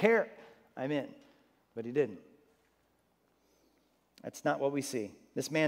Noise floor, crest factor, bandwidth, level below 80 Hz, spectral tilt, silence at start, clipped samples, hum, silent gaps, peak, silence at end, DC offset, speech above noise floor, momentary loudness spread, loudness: -73 dBFS; 24 dB; 16 kHz; -84 dBFS; -5 dB/octave; 0 s; under 0.1%; none; none; -12 dBFS; 0 s; under 0.1%; 40 dB; 17 LU; -35 LUFS